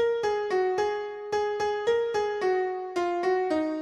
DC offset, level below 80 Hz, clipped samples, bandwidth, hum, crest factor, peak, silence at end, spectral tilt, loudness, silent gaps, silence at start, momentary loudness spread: under 0.1%; -64 dBFS; under 0.1%; 10.5 kHz; none; 12 dB; -14 dBFS; 0 s; -4.5 dB/octave; -27 LUFS; none; 0 s; 4 LU